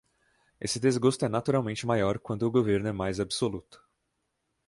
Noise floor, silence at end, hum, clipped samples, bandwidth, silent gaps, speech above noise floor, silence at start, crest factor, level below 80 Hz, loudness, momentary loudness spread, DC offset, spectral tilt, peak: -79 dBFS; 0.95 s; none; under 0.1%; 11.5 kHz; none; 51 dB; 0.6 s; 18 dB; -56 dBFS; -28 LUFS; 7 LU; under 0.1%; -5.5 dB/octave; -10 dBFS